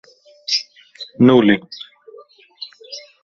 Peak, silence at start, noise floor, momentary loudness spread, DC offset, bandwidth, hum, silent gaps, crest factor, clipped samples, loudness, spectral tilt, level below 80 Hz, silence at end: 0 dBFS; 0.5 s; -45 dBFS; 23 LU; under 0.1%; 7.2 kHz; none; none; 18 dB; under 0.1%; -15 LUFS; -5.5 dB/octave; -56 dBFS; 0.25 s